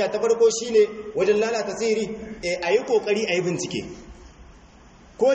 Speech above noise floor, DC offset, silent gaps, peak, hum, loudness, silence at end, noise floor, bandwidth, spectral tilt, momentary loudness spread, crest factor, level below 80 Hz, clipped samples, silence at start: 27 dB; under 0.1%; none; -8 dBFS; none; -23 LUFS; 0 s; -49 dBFS; 8.4 kHz; -4 dB/octave; 11 LU; 16 dB; -52 dBFS; under 0.1%; 0 s